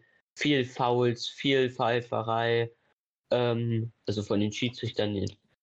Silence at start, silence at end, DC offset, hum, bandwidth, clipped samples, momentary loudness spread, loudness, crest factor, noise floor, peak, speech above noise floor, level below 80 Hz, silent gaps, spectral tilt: 0.35 s; 0.3 s; under 0.1%; none; 8.2 kHz; under 0.1%; 7 LU; -29 LUFS; 16 dB; -75 dBFS; -14 dBFS; 47 dB; -68 dBFS; 2.93-3.24 s; -6 dB/octave